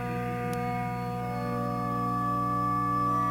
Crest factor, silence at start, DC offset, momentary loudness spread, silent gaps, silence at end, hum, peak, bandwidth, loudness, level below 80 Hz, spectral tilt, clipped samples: 12 dB; 0 s; under 0.1%; 6 LU; none; 0 s; 60 Hz at -45 dBFS; -18 dBFS; 17 kHz; -30 LUFS; -50 dBFS; -7.5 dB/octave; under 0.1%